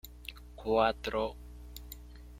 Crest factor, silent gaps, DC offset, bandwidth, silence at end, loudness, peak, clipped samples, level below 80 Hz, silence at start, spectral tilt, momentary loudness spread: 22 dB; none; under 0.1%; 16.5 kHz; 0 s; -32 LUFS; -14 dBFS; under 0.1%; -50 dBFS; 0.05 s; -5 dB/octave; 20 LU